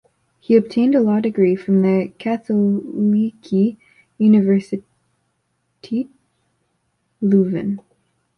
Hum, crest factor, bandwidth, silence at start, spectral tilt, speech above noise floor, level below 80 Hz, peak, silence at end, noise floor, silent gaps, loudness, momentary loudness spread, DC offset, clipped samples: none; 16 dB; 6 kHz; 0.5 s; -9.5 dB/octave; 53 dB; -62 dBFS; -2 dBFS; 0.6 s; -69 dBFS; none; -18 LUFS; 11 LU; under 0.1%; under 0.1%